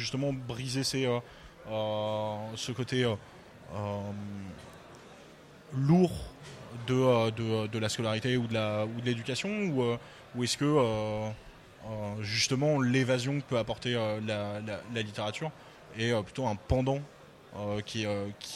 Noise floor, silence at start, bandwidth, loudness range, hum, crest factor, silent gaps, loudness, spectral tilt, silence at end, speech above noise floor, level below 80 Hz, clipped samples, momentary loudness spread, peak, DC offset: -53 dBFS; 0 s; 14.5 kHz; 5 LU; none; 18 dB; none; -31 LUFS; -5.5 dB/octave; 0 s; 22 dB; -54 dBFS; under 0.1%; 19 LU; -12 dBFS; under 0.1%